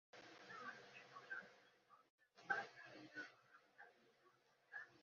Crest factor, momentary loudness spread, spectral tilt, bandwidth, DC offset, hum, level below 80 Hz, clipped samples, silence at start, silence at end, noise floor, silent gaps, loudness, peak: 28 dB; 20 LU; -0.5 dB/octave; 7 kHz; under 0.1%; none; under -90 dBFS; under 0.1%; 0.15 s; 0 s; -77 dBFS; 2.10-2.18 s; -53 LUFS; -30 dBFS